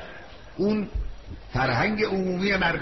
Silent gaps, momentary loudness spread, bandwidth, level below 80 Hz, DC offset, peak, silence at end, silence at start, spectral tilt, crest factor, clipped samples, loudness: none; 19 LU; 6.2 kHz; -38 dBFS; 0.3%; -12 dBFS; 0 s; 0 s; -4 dB/octave; 14 dB; under 0.1%; -25 LUFS